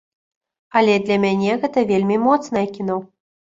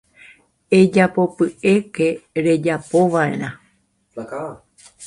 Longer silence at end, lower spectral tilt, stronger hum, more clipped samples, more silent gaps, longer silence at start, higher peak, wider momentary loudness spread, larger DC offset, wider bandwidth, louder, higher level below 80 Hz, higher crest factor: first, 0.45 s vs 0 s; about the same, -6.5 dB/octave vs -6.5 dB/octave; neither; neither; neither; about the same, 0.75 s vs 0.7 s; about the same, -2 dBFS vs 0 dBFS; second, 8 LU vs 16 LU; neither; second, 7.8 kHz vs 11.5 kHz; about the same, -19 LUFS vs -18 LUFS; about the same, -60 dBFS vs -58 dBFS; about the same, 18 dB vs 18 dB